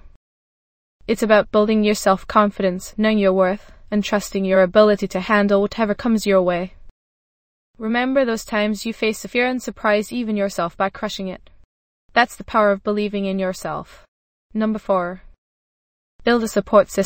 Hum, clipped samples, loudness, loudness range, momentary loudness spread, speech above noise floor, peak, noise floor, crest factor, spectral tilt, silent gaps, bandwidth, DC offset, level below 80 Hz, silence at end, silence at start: none; under 0.1%; -19 LUFS; 5 LU; 10 LU; over 71 dB; 0 dBFS; under -90 dBFS; 20 dB; -5.5 dB/octave; 0.16-1.00 s, 6.91-7.74 s, 11.64-12.09 s, 14.08-14.50 s, 15.38-16.19 s; 16.5 kHz; under 0.1%; -48 dBFS; 0 s; 0.05 s